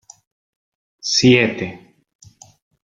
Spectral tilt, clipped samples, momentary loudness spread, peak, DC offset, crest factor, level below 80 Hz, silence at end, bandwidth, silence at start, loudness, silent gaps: -4 dB/octave; under 0.1%; 16 LU; -2 dBFS; under 0.1%; 20 dB; -54 dBFS; 1.05 s; 7.8 kHz; 1.05 s; -16 LUFS; none